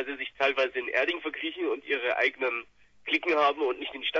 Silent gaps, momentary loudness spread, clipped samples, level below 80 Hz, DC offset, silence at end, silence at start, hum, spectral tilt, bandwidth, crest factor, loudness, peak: none; 8 LU; under 0.1%; -70 dBFS; under 0.1%; 0 s; 0 s; none; -3 dB/octave; 7.4 kHz; 18 dB; -28 LUFS; -12 dBFS